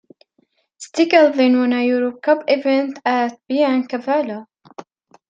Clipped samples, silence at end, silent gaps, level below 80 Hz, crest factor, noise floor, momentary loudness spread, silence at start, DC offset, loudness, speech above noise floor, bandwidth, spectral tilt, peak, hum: under 0.1%; 0.45 s; none; -74 dBFS; 16 dB; -64 dBFS; 10 LU; 0.8 s; under 0.1%; -17 LUFS; 47 dB; 9 kHz; -4 dB/octave; -2 dBFS; none